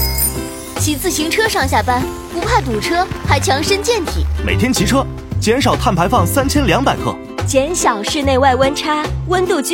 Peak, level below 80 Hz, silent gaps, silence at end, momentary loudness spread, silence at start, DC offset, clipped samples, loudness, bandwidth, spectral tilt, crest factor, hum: 0 dBFS; -26 dBFS; none; 0 s; 6 LU; 0 s; under 0.1%; under 0.1%; -15 LUFS; 17 kHz; -4.5 dB/octave; 14 dB; none